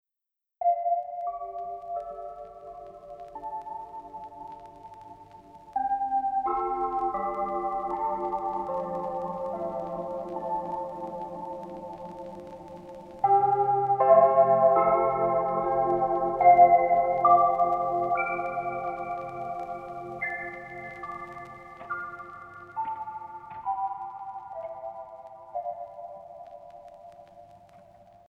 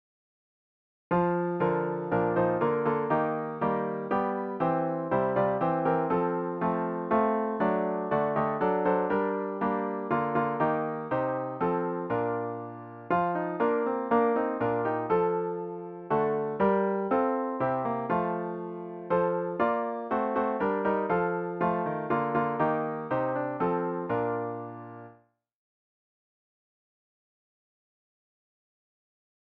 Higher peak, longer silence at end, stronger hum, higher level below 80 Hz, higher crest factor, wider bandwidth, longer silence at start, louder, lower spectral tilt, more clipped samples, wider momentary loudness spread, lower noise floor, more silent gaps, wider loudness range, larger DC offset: first, -6 dBFS vs -14 dBFS; second, 0.7 s vs 4.45 s; neither; about the same, -60 dBFS vs -64 dBFS; first, 22 dB vs 16 dB; about the same, 4.3 kHz vs 4.7 kHz; second, 0.6 s vs 1.1 s; about the same, -26 LUFS vs -28 LUFS; second, -8.5 dB/octave vs -10.5 dB/octave; neither; first, 23 LU vs 5 LU; first, -87 dBFS vs -61 dBFS; neither; first, 18 LU vs 2 LU; neither